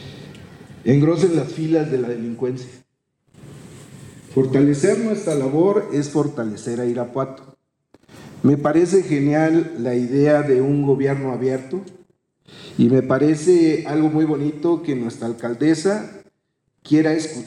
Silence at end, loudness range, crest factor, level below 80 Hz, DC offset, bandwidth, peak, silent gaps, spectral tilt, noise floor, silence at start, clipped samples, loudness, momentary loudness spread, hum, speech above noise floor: 0 s; 4 LU; 14 dB; -58 dBFS; under 0.1%; 11 kHz; -6 dBFS; none; -7 dB/octave; -71 dBFS; 0 s; under 0.1%; -19 LUFS; 11 LU; none; 53 dB